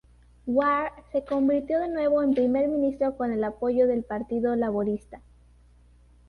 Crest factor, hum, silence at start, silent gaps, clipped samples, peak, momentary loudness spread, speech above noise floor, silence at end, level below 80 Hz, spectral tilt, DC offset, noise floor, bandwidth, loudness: 14 dB; 60 Hz at -50 dBFS; 0.45 s; none; under 0.1%; -12 dBFS; 7 LU; 31 dB; 1.1 s; -54 dBFS; -8.5 dB/octave; under 0.1%; -56 dBFS; 5.2 kHz; -26 LUFS